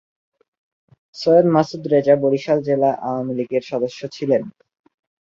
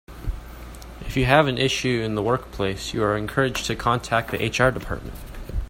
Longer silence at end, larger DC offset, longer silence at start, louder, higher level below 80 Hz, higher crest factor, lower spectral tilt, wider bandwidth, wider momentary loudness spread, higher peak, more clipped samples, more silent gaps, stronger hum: first, 0.7 s vs 0 s; neither; first, 1.15 s vs 0.1 s; first, -19 LUFS vs -23 LUFS; second, -64 dBFS vs -36 dBFS; about the same, 18 dB vs 20 dB; first, -7.5 dB/octave vs -5 dB/octave; second, 7.4 kHz vs 16.5 kHz; second, 10 LU vs 20 LU; about the same, -2 dBFS vs -2 dBFS; neither; neither; neither